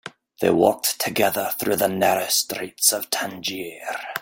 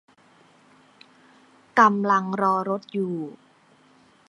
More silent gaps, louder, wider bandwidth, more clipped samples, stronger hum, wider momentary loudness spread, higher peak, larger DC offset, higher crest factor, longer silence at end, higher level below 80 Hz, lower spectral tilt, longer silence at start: neither; about the same, -21 LUFS vs -22 LUFS; first, 17 kHz vs 11 kHz; neither; neither; about the same, 11 LU vs 12 LU; about the same, -2 dBFS vs -2 dBFS; neither; about the same, 22 dB vs 24 dB; second, 0 s vs 1 s; first, -62 dBFS vs -80 dBFS; second, -2.5 dB/octave vs -6.5 dB/octave; second, 0.05 s vs 1.75 s